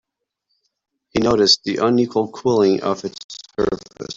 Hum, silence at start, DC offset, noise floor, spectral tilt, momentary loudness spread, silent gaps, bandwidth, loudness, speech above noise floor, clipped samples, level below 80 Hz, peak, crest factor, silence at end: none; 1.15 s; under 0.1%; -75 dBFS; -4.5 dB/octave; 15 LU; 3.24-3.29 s; 7.8 kHz; -18 LUFS; 56 dB; under 0.1%; -50 dBFS; -2 dBFS; 18 dB; 0.05 s